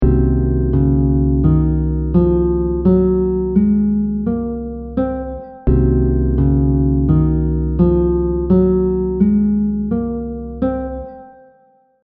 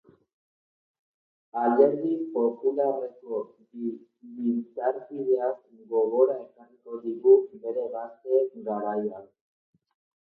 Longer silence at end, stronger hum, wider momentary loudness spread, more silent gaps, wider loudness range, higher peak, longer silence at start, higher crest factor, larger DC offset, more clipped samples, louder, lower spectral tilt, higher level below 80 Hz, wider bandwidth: second, 0.75 s vs 1.05 s; neither; second, 9 LU vs 15 LU; neither; about the same, 2 LU vs 4 LU; first, 0 dBFS vs -6 dBFS; second, 0 s vs 1.55 s; second, 14 dB vs 20 dB; neither; neither; first, -16 LUFS vs -27 LUFS; first, -12.5 dB/octave vs -11 dB/octave; first, -22 dBFS vs -84 dBFS; second, 2.4 kHz vs 3 kHz